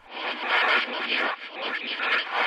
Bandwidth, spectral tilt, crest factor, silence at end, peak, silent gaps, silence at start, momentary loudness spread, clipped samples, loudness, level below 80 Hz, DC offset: 13 kHz; -1.5 dB/octave; 16 dB; 0 s; -10 dBFS; none; 0.05 s; 10 LU; under 0.1%; -25 LUFS; -78 dBFS; under 0.1%